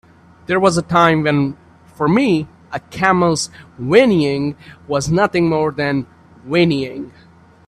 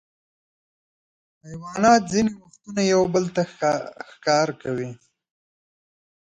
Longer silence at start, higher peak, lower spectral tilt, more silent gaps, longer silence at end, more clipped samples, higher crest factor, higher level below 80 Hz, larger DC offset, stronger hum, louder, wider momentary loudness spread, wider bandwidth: second, 0.5 s vs 1.45 s; first, 0 dBFS vs -4 dBFS; about the same, -5.5 dB/octave vs -5 dB/octave; neither; second, 0.6 s vs 1.45 s; neither; about the same, 16 dB vs 20 dB; first, -48 dBFS vs -60 dBFS; neither; neither; first, -16 LUFS vs -22 LUFS; second, 15 LU vs 19 LU; first, 12.5 kHz vs 9.4 kHz